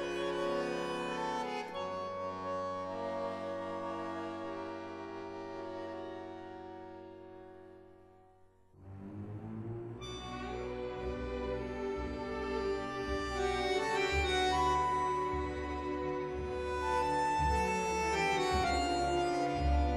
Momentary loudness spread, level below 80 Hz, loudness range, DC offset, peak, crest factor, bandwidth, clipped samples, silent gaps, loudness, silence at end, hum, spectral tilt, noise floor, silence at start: 15 LU; -46 dBFS; 15 LU; under 0.1%; -20 dBFS; 16 dB; 13 kHz; under 0.1%; none; -36 LUFS; 0 s; none; -5 dB/octave; -63 dBFS; 0 s